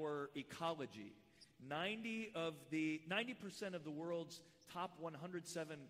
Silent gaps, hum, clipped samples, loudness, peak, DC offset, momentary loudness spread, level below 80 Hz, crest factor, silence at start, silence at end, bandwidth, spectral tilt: none; none; under 0.1%; -46 LUFS; -28 dBFS; under 0.1%; 14 LU; -84 dBFS; 18 dB; 0 s; 0 s; 15.5 kHz; -4.5 dB/octave